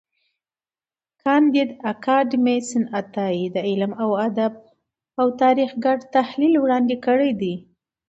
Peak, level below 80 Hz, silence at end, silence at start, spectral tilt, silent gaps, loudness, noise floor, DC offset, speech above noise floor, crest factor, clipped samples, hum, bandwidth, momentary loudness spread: -6 dBFS; -68 dBFS; 0.5 s; 1.25 s; -6 dB/octave; none; -20 LUFS; under -90 dBFS; under 0.1%; over 70 dB; 16 dB; under 0.1%; none; 8.2 kHz; 8 LU